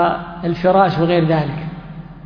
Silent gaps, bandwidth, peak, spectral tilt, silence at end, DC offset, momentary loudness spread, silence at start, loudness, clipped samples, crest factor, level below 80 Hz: none; 5.4 kHz; 0 dBFS; -9 dB/octave; 0 s; under 0.1%; 17 LU; 0 s; -16 LUFS; under 0.1%; 16 dB; -42 dBFS